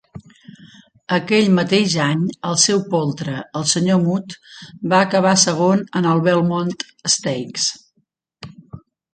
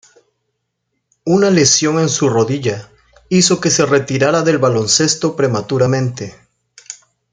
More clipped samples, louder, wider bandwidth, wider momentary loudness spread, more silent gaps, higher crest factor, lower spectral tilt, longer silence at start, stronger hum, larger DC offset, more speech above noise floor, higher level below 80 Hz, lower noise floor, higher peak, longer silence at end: neither; second, -17 LUFS vs -14 LUFS; about the same, 9.4 kHz vs 10 kHz; second, 11 LU vs 18 LU; neither; about the same, 18 dB vs 16 dB; about the same, -4 dB/octave vs -4 dB/octave; second, 0.15 s vs 1.25 s; neither; neither; second, 49 dB vs 58 dB; second, -60 dBFS vs -54 dBFS; second, -67 dBFS vs -72 dBFS; about the same, 0 dBFS vs 0 dBFS; about the same, 0.35 s vs 0.4 s